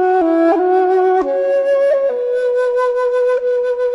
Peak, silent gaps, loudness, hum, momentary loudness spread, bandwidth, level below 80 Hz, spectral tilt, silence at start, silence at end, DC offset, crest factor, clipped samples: -4 dBFS; none; -15 LUFS; none; 4 LU; 11 kHz; -56 dBFS; -5 dB/octave; 0 s; 0 s; under 0.1%; 10 dB; under 0.1%